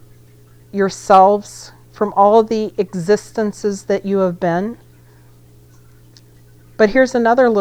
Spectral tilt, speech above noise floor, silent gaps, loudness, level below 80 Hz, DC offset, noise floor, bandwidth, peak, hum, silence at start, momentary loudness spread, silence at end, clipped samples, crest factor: -6 dB/octave; 31 dB; none; -15 LUFS; -48 dBFS; under 0.1%; -45 dBFS; 14 kHz; 0 dBFS; 60 Hz at -45 dBFS; 0.75 s; 12 LU; 0 s; under 0.1%; 16 dB